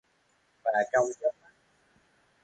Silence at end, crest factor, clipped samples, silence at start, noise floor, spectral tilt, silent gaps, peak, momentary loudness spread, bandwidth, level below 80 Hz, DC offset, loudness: 1.1 s; 20 dB; under 0.1%; 0.65 s; -70 dBFS; -4 dB/octave; none; -14 dBFS; 7 LU; 9 kHz; -74 dBFS; under 0.1%; -29 LUFS